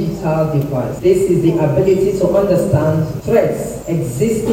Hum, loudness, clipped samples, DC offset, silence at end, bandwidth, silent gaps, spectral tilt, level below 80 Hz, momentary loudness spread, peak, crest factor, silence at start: none; -15 LUFS; under 0.1%; under 0.1%; 0 s; 16.5 kHz; none; -7.5 dB/octave; -38 dBFS; 7 LU; 0 dBFS; 14 dB; 0 s